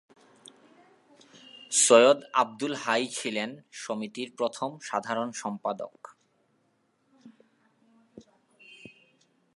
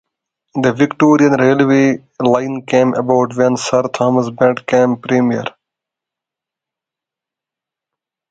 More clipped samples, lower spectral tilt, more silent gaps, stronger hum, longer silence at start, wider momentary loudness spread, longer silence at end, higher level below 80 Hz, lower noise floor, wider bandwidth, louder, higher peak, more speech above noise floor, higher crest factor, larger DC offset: neither; second, -2 dB/octave vs -6 dB/octave; neither; neither; first, 1.55 s vs 0.55 s; first, 20 LU vs 6 LU; second, 1.35 s vs 2.8 s; second, -84 dBFS vs -58 dBFS; second, -71 dBFS vs -86 dBFS; first, 11.5 kHz vs 9 kHz; second, -26 LUFS vs -14 LUFS; second, -4 dBFS vs 0 dBFS; second, 44 dB vs 72 dB; first, 26 dB vs 16 dB; neither